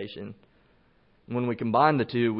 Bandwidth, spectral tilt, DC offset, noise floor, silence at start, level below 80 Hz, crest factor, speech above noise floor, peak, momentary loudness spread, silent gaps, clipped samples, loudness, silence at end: 5.6 kHz; -11 dB/octave; under 0.1%; -63 dBFS; 0 s; -66 dBFS; 20 dB; 37 dB; -8 dBFS; 19 LU; none; under 0.1%; -25 LUFS; 0 s